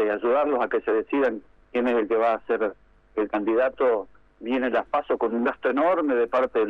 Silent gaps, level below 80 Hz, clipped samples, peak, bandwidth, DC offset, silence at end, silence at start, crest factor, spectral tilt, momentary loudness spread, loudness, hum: none; -58 dBFS; under 0.1%; -12 dBFS; 5.8 kHz; under 0.1%; 0 s; 0 s; 12 dB; -7 dB/octave; 8 LU; -24 LUFS; none